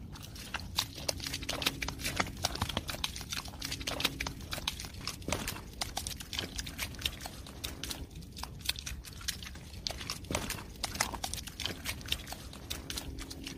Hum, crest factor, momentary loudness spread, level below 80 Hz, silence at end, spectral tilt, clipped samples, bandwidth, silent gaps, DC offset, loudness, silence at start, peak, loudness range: none; 32 dB; 9 LU; -48 dBFS; 0 s; -2.5 dB/octave; under 0.1%; 16 kHz; none; under 0.1%; -37 LUFS; 0 s; -8 dBFS; 4 LU